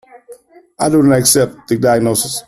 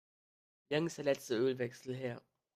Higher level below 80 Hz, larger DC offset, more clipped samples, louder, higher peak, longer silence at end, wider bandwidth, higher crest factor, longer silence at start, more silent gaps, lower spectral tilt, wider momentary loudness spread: first, -48 dBFS vs -80 dBFS; neither; neither; first, -13 LUFS vs -37 LUFS; first, 0 dBFS vs -20 dBFS; second, 0.05 s vs 0.35 s; about the same, 14 kHz vs 15 kHz; about the same, 14 dB vs 18 dB; second, 0.15 s vs 0.7 s; neither; about the same, -4.5 dB/octave vs -5.5 dB/octave; about the same, 7 LU vs 9 LU